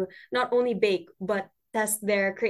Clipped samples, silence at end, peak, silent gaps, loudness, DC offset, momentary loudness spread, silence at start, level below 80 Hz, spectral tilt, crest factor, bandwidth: under 0.1%; 0 s; -10 dBFS; none; -27 LUFS; under 0.1%; 6 LU; 0 s; -70 dBFS; -3.5 dB/octave; 18 dB; 13 kHz